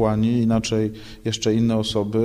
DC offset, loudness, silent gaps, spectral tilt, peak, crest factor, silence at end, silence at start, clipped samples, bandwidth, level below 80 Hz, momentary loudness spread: under 0.1%; -22 LUFS; none; -6 dB/octave; -6 dBFS; 14 dB; 0 s; 0 s; under 0.1%; 12.5 kHz; -44 dBFS; 8 LU